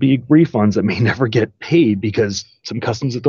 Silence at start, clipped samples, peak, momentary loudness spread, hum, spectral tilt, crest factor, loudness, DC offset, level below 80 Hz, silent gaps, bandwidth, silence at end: 0 s; under 0.1%; -2 dBFS; 10 LU; none; -6.5 dB/octave; 14 dB; -16 LUFS; under 0.1%; -52 dBFS; none; 7.2 kHz; 0 s